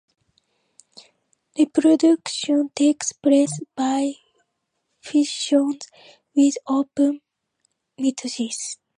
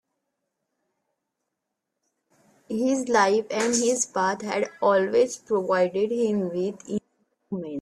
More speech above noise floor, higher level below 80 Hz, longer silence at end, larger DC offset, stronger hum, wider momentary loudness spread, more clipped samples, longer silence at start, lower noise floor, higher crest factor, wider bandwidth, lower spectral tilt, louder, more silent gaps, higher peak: second, 55 dB vs 59 dB; about the same, -74 dBFS vs -70 dBFS; first, 0.25 s vs 0 s; neither; neither; about the same, 12 LU vs 12 LU; neither; second, 1.55 s vs 2.7 s; second, -75 dBFS vs -82 dBFS; about the same, 16 dB vs 20 dB; second, 10.5 kHz vs 13 kHz; about the same, -3.5 dB/octave vs -4 dB/octave; first, -21 LUFS vs -24 LUFS; neither; about the same, -6 dBFS vs -6 dBFS